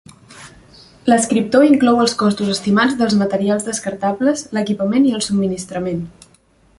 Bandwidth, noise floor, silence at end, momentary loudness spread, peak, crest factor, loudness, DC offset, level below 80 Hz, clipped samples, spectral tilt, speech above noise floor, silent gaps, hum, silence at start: 11.5 kHz; -53 dBFS; 0.7 s; 10 LU; -2 dBFS; 16 dB; -16 LUFS; under 0.1%; -52 dBFS; under 0.1%; -5 dB/octave; 38 dB; none; none; 0.3 s